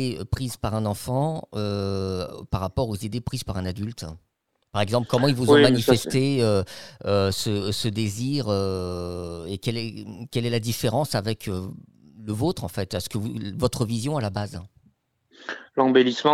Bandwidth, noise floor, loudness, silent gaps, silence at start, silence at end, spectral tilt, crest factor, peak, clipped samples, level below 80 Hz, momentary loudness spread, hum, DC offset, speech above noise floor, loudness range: 16.5 kHz; -64 dBFS; -25 LUFS; none; 0 s; 0 s; -5.5 dB/octave; 20 dB; -4 dBFS; under 0.1%; -48 dBFS; 14 LU; none; 0.3%; 40 dB; 8 LU